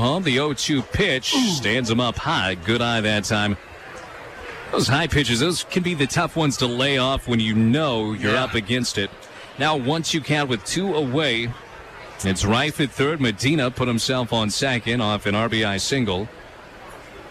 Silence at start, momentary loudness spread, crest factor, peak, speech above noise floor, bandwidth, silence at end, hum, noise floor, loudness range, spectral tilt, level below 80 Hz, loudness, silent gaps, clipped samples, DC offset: 0 s; 18 LU; 12 dB; -10 dBFS; 20 dB; 15 kHz; 0 s; none; -41 dBFS; 2 LU; -4.5 dB/octave; -44 dBFS; -21 LUFS; none; under 0.1%; under 0.1%